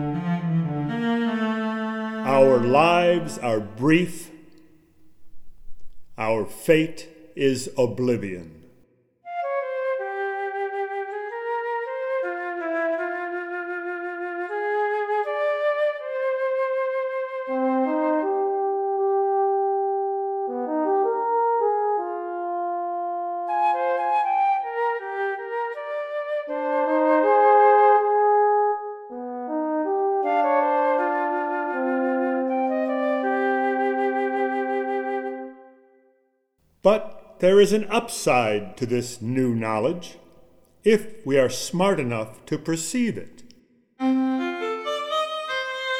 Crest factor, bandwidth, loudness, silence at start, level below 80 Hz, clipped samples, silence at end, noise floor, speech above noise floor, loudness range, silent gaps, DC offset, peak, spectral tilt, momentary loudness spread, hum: 20 dB; 15.5 kHz; -23 LUFS; 0 s; -60 dBFS; under 0.1%; 0 s; -68 dBFS; 46 dB; 7 LU; none; under 0.1%; -2 dBFS; -5.5 dB/octave; 11 LU; none